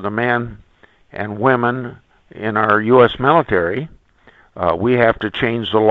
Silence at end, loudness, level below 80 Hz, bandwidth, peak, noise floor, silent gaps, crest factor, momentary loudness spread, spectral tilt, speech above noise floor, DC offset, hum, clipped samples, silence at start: 0 s; -16 LUFS; -46 dBFS; 5.2 kHz; 0 dBFS; -50 dBFS; none; 16 dB; 15 LU; -9 dB/octave; 34 dB; under 0.1%; none; under 0.1%; 0 s